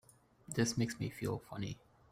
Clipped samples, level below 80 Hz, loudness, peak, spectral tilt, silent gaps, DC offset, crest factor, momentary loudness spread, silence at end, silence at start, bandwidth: under 0.1%; -64 dBFS; -39 LUFS; -20 dBFS; -5 dB/octave; none; under 0.1%; 20 dB; 10 LU; 0.35 s; 0.5 s; 16 kHz